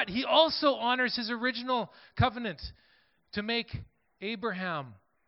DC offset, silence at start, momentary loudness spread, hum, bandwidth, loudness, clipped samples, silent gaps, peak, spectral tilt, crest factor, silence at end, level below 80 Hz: under 0.1%; 0 s; 17 LU; none; 5.8 kHz; -29 LUFS; under 0.1%; none; -8 dBFS; -9 dB/octave; 22 dB; 0.35 s; -56 dBFS